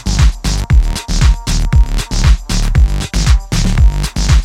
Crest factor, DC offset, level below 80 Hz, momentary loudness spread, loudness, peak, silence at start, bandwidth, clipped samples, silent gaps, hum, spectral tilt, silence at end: 10 dB; under 0.1%; -12 dBFS; 4 LU; -14 LUFS; 0 dBFS; 0 s; 13.5 kHz; under 0.1%; none; none; -4.5 dB/octave; 0 s